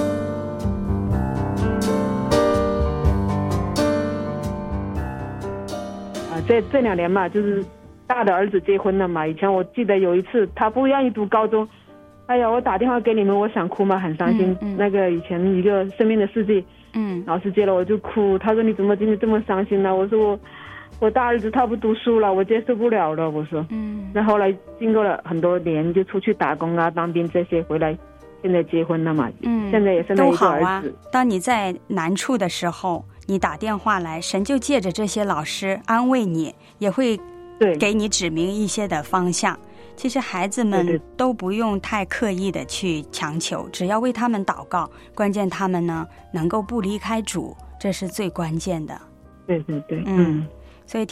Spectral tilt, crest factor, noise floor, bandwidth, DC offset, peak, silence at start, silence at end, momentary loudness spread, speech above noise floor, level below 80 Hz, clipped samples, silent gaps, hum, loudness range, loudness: -6 dB/octave; 16 dB; -47 dBFS; 15 kHz; under 0.1%; -4 dBFS; 0 s; 0.05 s; 9 LU; 26 dB; -40 dBFS; under 0.1%; none; none; 4 LU; -21 LUFS